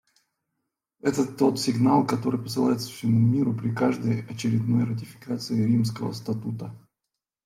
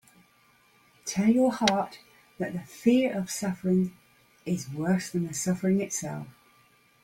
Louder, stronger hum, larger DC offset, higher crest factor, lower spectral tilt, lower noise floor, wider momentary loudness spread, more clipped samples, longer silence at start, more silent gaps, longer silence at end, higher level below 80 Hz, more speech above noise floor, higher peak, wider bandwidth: first, -25 LUFS vs -28 LUFS; neither; neither; second, 16 dB vs 22 dB; first, -7 dB/octave vs -5 dB/octave; first, -85 dBFS vs -63 dBFS; second, 11 LU vs 14 LU; neither; about the same, 1.05 s vs 1.05 s; neither; about the same, 0.65 s vs 0.75 s; about the same, -66 dBFS vs -66 dBFS; first, 61 dB vs 36 dB; about the same, -8 dBFS vs -6 dBFS; about the same, 15 kHz vs 16.5 kHz